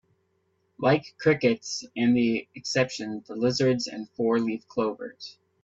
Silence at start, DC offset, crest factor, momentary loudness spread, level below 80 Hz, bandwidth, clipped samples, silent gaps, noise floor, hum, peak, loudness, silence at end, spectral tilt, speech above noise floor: 0.8 s; under 0.1%; 18 dB; 12 LU; -66 dBFS; 7.8 kHz; under 0.1%; none; -71 dBFS; none; -8 dBFS; -26 LUFS; 0.3 s; -5.5 dB/octave; 46 dB